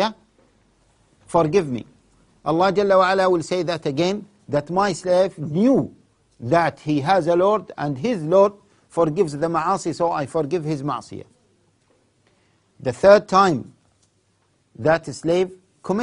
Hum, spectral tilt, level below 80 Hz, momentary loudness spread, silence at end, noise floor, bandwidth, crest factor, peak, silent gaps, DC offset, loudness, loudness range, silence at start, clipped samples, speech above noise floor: none; -6 dB/octave; -56 dBFS; 13 LU; 0 s; -64 dBFS; 11 kHz; 22 dB; 0 dBFS; none; under 0.1%; -20 LUFS; 4 LU; 0 s; under 0.1%; 45 dB